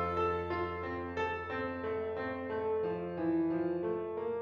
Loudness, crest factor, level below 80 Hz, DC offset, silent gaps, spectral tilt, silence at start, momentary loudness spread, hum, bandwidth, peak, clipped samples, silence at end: -36 LUFS; 12 dB; -60 dBFS; under 0.1%; none; -8 dB/octave; 0 s; 5 LU; none; 7 kHz; -22 dBFS; under 0.1%; 0 s